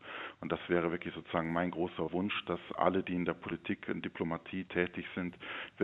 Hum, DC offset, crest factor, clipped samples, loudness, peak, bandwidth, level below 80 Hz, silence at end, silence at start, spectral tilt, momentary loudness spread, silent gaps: none; under 0.1%; 24 dB; under 0.1%; -36 LUFS; -12 dBFS; 4.1 kHz; -66 dBFS; 0 s; 0 s; -8.5 dB/octave; 8 LU; none